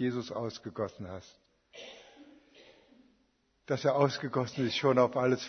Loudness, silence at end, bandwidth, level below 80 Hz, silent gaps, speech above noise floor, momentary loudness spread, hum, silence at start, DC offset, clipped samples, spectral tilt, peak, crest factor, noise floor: -31 LUFS; 0 s; 6.6 kHz; -72 dBFS; none; 42 dB; 22 LU; none; 0 s; under 0.1%; under 0.1%; -6 dB/octave; -12 dBFS; 22 dB; -73 dBFS